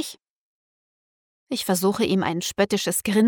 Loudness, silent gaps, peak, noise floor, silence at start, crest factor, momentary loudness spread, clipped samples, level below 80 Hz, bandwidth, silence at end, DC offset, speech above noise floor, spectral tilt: -23 LUFS; 0.30-1.47 s; -6 dBFS; under -90 dBFS; 0 s; 20 dB; 8 LU; under 0.1%; -60 dBFS; over 20 kHz; 0 s; under 0.1%; over 68 dB; -4 dB/octave